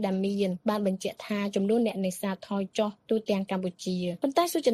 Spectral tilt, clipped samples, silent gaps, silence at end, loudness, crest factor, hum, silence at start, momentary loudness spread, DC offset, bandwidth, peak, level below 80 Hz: -5.5 dB/octave; under 0.1%; none; 0 s; -29 LUFS; 18 dB; none; 0 s; 6 LU; under 0.1%; 15 kHz; -10 dBFS; -70 dBFS